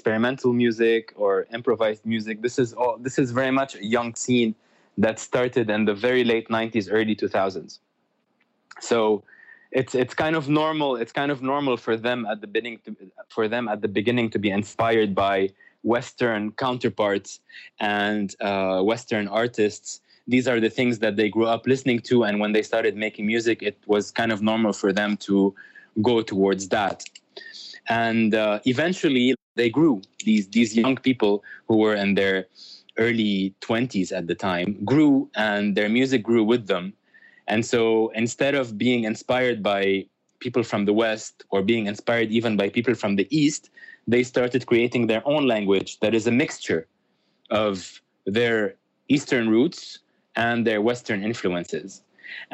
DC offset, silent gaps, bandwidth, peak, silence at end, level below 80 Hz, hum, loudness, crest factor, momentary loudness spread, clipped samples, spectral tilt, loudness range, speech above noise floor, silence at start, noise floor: under 0.1%; 29.42-29.55 s; 8.6 kHz; -8 dBFS; 0.1 s; -66 dBFS; none; -23 LUFS; 16 dB; 8 LU; under 0.1%; -5.5 dB/octave; 3 LU; 48 dB; 0.05 s; -71 dBFS